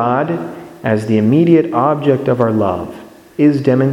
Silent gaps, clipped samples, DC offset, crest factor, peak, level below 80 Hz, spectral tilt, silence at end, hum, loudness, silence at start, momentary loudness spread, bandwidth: none; under 0.1%; under 0.1%; 14 dB; 0 dBFS; -54 dBFS; -9 dB/octave; 0 s; none; -14 LUFS; 0 s; 12 LU; 11.5 kHz